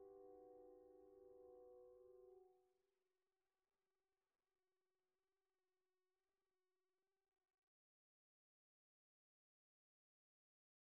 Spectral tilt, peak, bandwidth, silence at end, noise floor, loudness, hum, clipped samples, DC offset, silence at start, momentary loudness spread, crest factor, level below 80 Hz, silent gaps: 2.5 dB/octave; -54 dBFS; 1.9 kHz; 8 s; under -90 dBFS; -67 LUFS; none; under 0.1%; under 0.1%; 0 s; 4 LU; 18 dB; under -90 dBFS; none